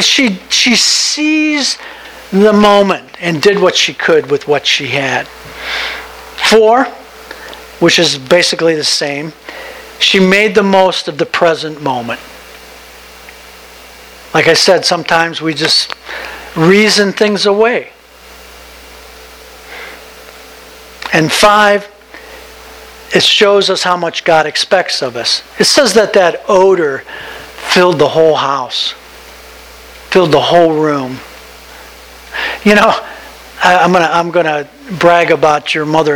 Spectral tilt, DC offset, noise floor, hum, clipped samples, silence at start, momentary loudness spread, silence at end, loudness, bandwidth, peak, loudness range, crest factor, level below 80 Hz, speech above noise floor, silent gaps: -3.5 dB/octave; under 0.1%; -36 dBFS; none; 0.5%; 0 s; 20 LU; 0 s; -10 LUFS; over 20 kHz; 0 dBFS; 4 LU; 12 dB; -46 dBFS; 26 dB; none